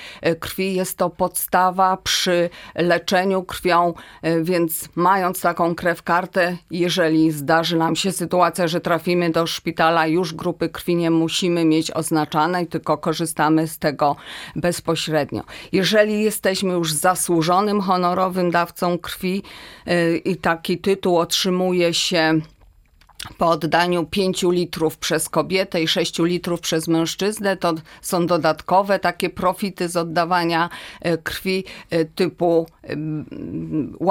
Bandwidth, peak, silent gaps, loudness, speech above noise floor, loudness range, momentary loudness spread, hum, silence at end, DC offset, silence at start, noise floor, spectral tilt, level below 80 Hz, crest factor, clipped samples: 17.5 kHz; -2 dBFS; none; -20 LUFS; 33 dB; 2 LU; 7 LU; none; 0 s; under 0.1%; 0 s; -53 dBFS; -4.5 dB/octave; -52 dBFS; 18 dB; under 0.1%